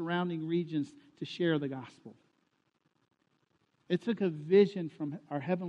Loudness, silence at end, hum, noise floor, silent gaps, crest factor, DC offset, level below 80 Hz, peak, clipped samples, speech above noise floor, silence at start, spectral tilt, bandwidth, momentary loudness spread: -32 LUFS; 0 s; none; -76 dBFS; none; 20 dB; under 0.1%; -82 dBFS; -14 dBFS; under 0.1%; 44 dB; 0 s; -8 dB/octave; 8.4 kHz; 17 LU